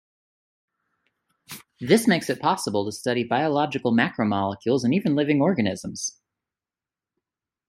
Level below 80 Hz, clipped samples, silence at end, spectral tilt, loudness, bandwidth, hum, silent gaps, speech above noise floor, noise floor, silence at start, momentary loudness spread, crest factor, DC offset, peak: -66 dBFS; under 0.1%; 1.6 s; -5 dB/octave; -23 LUFS; 16 kHz; none; none; over 67 dB; under -90 dBFS; 1.5 s; 11 LU; 22 dB; under 0.1%; -4 dBFS